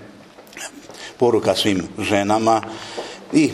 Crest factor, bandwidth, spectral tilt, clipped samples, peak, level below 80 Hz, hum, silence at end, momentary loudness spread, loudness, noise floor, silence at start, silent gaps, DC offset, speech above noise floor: 20 dB; 14.5 kHz; -4.5 dB/octave; under 0.1%; 0 dBFS; -56 dBFS; none; 0 s; 17 LU; -19 LUFS; -43 dBFS; 0 s; none; under 0.1%; 24 dB